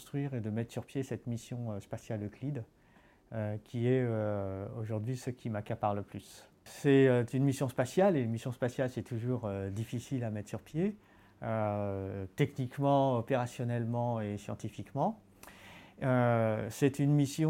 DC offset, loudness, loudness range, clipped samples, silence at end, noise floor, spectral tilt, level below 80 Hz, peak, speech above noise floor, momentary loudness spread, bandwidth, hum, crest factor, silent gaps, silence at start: under 0.1%; -34 LUFS; 6 LU; under 0.1%; 0 s; -63 dBFS; -7.5 dB/octave; -68 dBFS; -14 dBFS; 30 dB; 14 LU; 16.5 kHz; none; 18 dB; none; 0 s